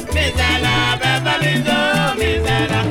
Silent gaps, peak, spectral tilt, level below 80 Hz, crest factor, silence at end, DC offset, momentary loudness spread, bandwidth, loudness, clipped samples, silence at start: none; -4 dBFS; -4.5 dB/octave; -28 dBFS; 14 dB; 0 s; 0.1%; 2 LU; 17.5 kHz; -16 LUFS; under 0.1%; 0 s